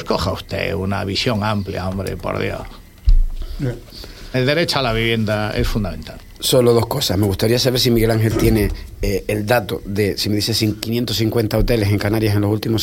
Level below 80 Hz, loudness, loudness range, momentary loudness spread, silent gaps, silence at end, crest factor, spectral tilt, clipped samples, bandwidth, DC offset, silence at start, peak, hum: -26 dBFS; -19 LUFS; 5 LU; 10 LU; none; 0 s; 16 dB; -5.5 dB/octave; under 0.1%; 17 kHz; under 0.1%; 0 s; -2 dBFS; none